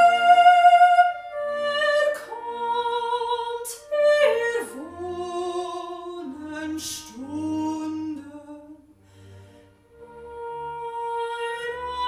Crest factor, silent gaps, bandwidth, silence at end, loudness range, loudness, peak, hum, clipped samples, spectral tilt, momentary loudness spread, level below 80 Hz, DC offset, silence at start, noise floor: 20 dB; none; 15 kHz; 0 s; 14 LU; -22 LUFS; -4 dBFS; none; under 0.1%; -3 dB/octave; 20 LU; -62 dBFS; under 0.1%; 0 s; -53 dBFS